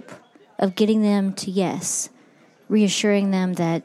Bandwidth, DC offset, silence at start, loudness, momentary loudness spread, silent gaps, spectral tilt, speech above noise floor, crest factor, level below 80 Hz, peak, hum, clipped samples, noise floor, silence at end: 13.5 kHz; under 0.1%; 0.1 s; -21 LUFS; 7 LU; none; -5 dB/octave; 33 dB; 14 dB; -74 dBFS; -6 dBFS; none; under 0.1%; -54 dBFS; 0.05 s